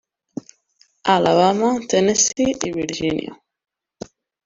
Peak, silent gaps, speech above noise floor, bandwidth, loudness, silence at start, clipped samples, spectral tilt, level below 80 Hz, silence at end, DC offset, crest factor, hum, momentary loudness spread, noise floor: -2 dBFS; none; 42 dB; 8 kHz; -18 LUFS; 1.05 s; under 0.1%; -3.5 dB/octave; -54 dBFS; 1.1 s; under 0.1%; 18 dB; none; 23 LU; -60 dBFS